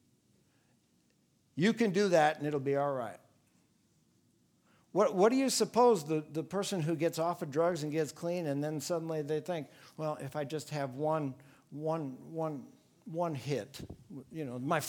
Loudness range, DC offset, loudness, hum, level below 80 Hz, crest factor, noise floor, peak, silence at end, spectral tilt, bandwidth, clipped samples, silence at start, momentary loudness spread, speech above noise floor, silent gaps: 7 LU; under 0.1%; -33 LUFS; none; -74 dBFS; 20 dB; -72 dBFS; -14 dBFS; 0 s; -5.5 dB/octave; 19 kHz; under 0.1%; 1.55 s; 15 LU; 39 dB; none